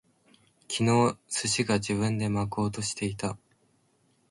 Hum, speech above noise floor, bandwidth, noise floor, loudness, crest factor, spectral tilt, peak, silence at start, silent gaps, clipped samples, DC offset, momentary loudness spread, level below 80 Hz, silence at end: none; 41 dB; 11.5 kHz; -68 dBFS; -28 LUFS; 18 dB; -4.5 dB/octave; -12 dBFS; 0.7 s; none; under 0.1%; under 0.1%; 11 LU; -56 dBFS; 0.95 s